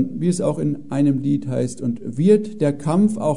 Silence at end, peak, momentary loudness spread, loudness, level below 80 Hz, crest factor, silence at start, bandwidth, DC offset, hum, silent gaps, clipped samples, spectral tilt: 0 s; -4 dBFS; 8 LU; -20 LUFS; -58 dBFS; 16 dB; 0 s; 11 kHz; 1%; none; none; under 0.1%; -8 dB/octave